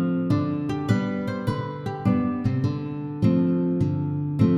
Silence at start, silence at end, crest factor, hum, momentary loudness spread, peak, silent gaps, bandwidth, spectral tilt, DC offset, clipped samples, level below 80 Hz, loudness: 0 s; 0 s; 16 dB; none; 6 LU; -8 dBFS; none; 10.5 kHz; -9 dB/octave; under 0.1%; under 0.1%; -50 dBFS; -25 LUFS